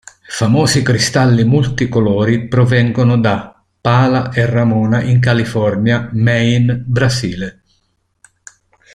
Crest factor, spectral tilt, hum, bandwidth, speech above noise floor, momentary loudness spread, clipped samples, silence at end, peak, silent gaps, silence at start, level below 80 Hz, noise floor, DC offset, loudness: 12 dB; -6 dB/octave; none; 12 kHz; 50 dB; 6 LU; under 0.1%; 1.45 s; 0 dBFS; none; 0.3 s; -42 dBFS; -63 dBFS; under 0.1%; -13 LUFS